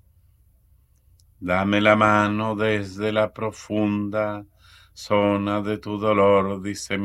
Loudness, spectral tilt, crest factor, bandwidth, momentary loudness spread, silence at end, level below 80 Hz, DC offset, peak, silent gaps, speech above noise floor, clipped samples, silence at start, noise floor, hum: -22 LUFS; -6 dB/octave; 22 dB; 13 kHz; 11 LU; 0 s; -56 dBFS; under 0.1%; -2 dBFS; none; 37 dB; under 0.1%; 1.4 s; -58 dBFS; 60 Hz at -60 dBFS